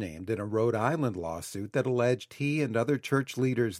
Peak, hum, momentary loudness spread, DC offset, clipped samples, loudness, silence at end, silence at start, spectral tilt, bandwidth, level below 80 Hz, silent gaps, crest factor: -10 dBFS; none; 7 LU; under 0.1%; under 0.1%; -30 LUFS; 0 s; 0 s; -6.5 dB/octave; 15.5 kHz; -62 dBFS; none; 18 dB